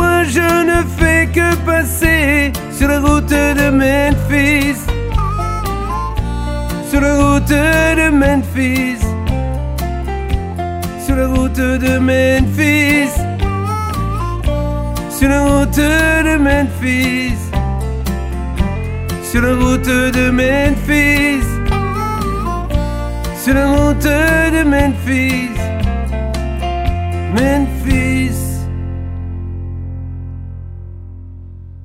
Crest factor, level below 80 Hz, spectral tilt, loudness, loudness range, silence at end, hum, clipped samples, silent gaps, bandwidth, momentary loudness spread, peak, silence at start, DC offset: 14 dB; -22 dBFS; -5.5 dB/octave; -14 LUFS; 5 LU; 0 s; none; under 0.1%; none; 16.5 kHz; 10 LU; 0 dBFS; 0 s; under 0.1%